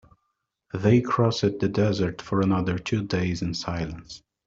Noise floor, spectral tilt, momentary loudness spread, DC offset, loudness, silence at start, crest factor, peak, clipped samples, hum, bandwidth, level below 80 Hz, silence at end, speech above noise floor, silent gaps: -78 dBFS; -6.5 dB/octave; 12 LU; under 0.1%; -25 LUFS; 0.75 s; 18 dB; -6 dBFS; under 0.1%; none; 7.8 kHz; -52 dBFS; 0.3 s; 54 dB; none